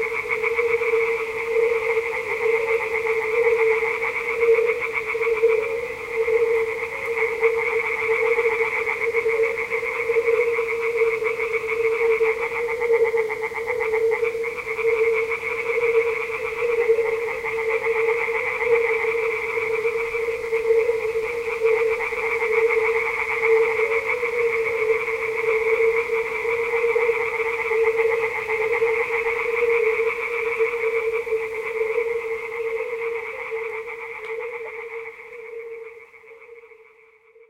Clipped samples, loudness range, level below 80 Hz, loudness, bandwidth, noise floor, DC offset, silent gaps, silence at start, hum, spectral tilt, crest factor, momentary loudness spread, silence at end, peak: under 0.1%; 5 LU; -56 dBFS; -22 LUFS; 15.5 kHz; -53 dBFS; under 0.1%; none; 0 s; none; -3 dB/octave; 16 dB; 7 LU; 0.85 s; -6 dBFS